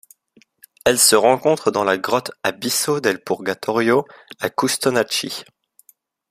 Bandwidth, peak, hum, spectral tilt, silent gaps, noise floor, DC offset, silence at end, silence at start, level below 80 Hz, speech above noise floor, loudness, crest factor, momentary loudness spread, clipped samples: 15.5 kHz; 0 dBFS; none; -2.5 dB/octave; none; -57 dBFS; under 0.1%; 0.9 s; 0.85 s; -60 dBFS; 38 dB; -18 LUFS; 20 dB; 12 LU; under 0.1%